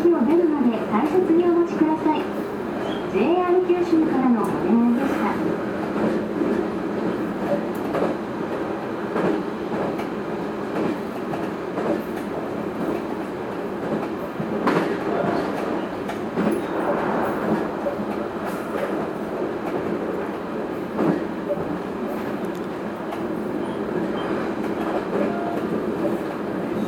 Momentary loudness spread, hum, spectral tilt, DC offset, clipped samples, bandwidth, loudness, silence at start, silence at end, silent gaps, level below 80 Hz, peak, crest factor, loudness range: 8 LU; none; -7.5 dB/octave; under 0.1%; under 0.1%; 17.5 kHz; -24 LUFS; 0 s; 0 s; none; -54 dBFS; -6 dBFS; 16 dB; 6 LU